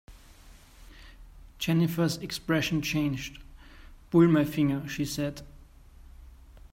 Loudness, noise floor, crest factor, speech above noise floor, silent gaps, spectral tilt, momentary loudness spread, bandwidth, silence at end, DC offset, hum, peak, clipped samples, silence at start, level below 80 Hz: -27 LUFS; -52 dBFS; 20 dB; 26 dB; none; -6 dB/octave; 12 LU; 16 kHz; 0.15 s; under 0.1%; none; -10 dBFS; under 0.1%; 0.1 s; -50 dBFS